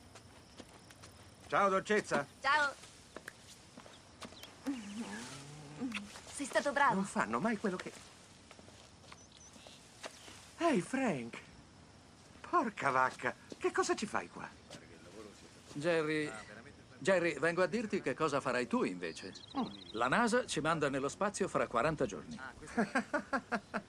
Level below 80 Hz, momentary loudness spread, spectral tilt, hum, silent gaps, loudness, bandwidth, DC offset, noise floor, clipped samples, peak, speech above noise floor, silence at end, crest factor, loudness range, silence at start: -68 dBFS; 24 LU; -4.5 dB/octave; none; none; -35 LUFS; 14.5 kHz; under 0.1%; -59 dBFS; under 0.1%; -16 dBFS; 24 dB; 0 s; 20 dB; 7 LU; 0 s